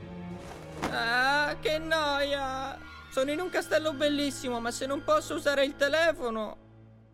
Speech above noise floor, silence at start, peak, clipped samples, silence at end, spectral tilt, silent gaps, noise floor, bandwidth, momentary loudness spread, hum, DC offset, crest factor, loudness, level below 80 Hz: 25 dB; 0 s; -14 dBFS; under 0.1%; 0.25 s; -3.5 dB/octave; none; -54 dBFS; 16 kHz; 14 LU; none; under 0.1%; 16 dB; -29 LUFS; -52 dBFS